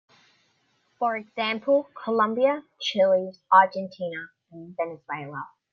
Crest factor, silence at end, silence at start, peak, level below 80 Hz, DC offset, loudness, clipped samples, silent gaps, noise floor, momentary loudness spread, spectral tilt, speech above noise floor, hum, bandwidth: 22 dB; 0.25 s; 1 s; -4 dBFS; -78 dBFS; under 0.1%; -25 LUFS; under 0.1%; none; -69 dBFS; 18 LU; -5 dB/octave; 44 dB; none; 6.8 kHz